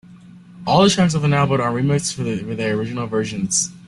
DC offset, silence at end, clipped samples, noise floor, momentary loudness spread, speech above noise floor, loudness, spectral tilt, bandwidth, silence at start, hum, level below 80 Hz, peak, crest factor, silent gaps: under 0.1%; 0.1 s; under 0.1%; -42 dBFS; 9 LU; 24 dB; -19 LUFS; -4.5 dB/octave; 12 kHz; 0.1 s; none; -50 dBFS; -2 dBFS; 18 dB; none